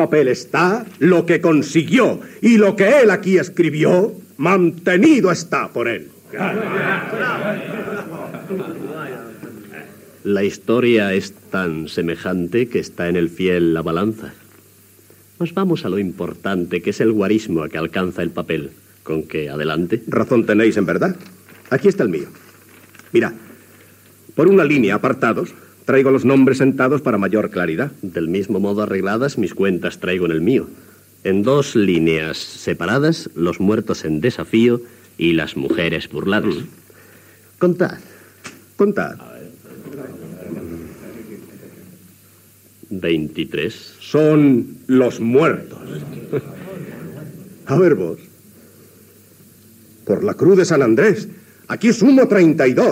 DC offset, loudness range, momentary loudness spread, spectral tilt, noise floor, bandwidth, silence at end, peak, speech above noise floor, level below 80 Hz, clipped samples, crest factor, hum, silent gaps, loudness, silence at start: under 0.1%; 9 LU; 20 LU; -6.5 dB/octave; -49 dBFS; 16 kHz; 0 s; -2 dBFS; 32 dB; -54 dBFS; under 0.1%; 16 dB; none; none; -17 LUFS; 0 s